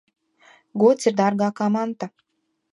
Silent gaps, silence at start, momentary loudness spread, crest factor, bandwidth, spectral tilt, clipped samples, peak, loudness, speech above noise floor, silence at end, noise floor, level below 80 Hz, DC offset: none; 0.75 s; 16 LU; 18 dB; 11 kHz; -6 dB/octave; under 0.1%; -6 dBFS; -21 LUFS; 54 dB; 0.65 s; -74 dBFS; -74 dBFS; under 0.1%